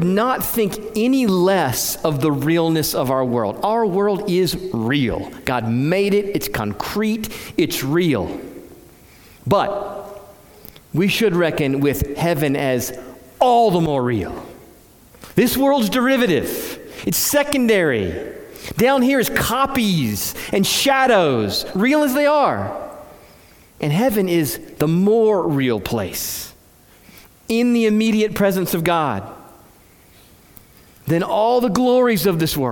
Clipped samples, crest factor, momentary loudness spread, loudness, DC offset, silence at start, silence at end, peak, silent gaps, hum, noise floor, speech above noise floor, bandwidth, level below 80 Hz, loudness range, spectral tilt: under 0.1%; 18 dB; 11 LU; -18 LUFS; under 0.1%; 0 s; 0 s; 0 dBFS; none; none; -49 dBFS; 32 dB; 18 kHz; -46 dBFS; 5 LU; -5 dB/octave